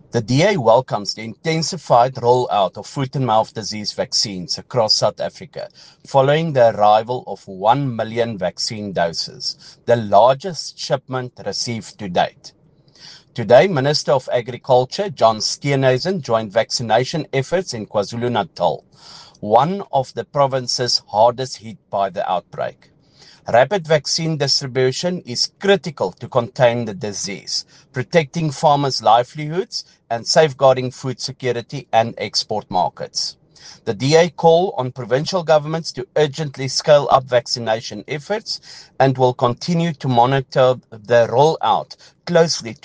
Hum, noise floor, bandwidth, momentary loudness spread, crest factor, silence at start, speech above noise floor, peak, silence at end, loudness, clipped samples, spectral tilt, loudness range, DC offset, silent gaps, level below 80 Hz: none; -49 dBFS; 10 kHz; 12 LU; 18 dB; 0.15 s; 31 dB; 0 dBFS; 0.1 s; -18 LUFS; under 0.1%; -4.5 dB/octave; 3 LU; under 0.1%; none; -58 dBFS